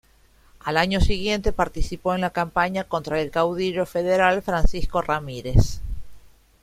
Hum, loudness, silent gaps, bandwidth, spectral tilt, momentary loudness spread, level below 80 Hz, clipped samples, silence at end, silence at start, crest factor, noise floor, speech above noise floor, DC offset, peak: none; -23 LUFS; none; 14.5 kHz; -5.5 dB/octave; 7 LU; -28 dBFS; under 0.1%; 0.45 s; 0.65 s; 18 dB; -56 dBFS; 35 dB; under 0.1%; -4 dBFS